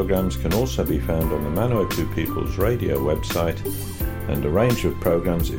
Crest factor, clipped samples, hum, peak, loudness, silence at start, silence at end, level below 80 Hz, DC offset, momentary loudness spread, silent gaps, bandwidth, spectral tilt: 14 dB; under 0.1%; none; -8 dBFS; -23 LUFS; 0 s; 0 s; -30 dBFS; under 0.1%; 5 LU; none; 17 kHz; -6.5 dB/octave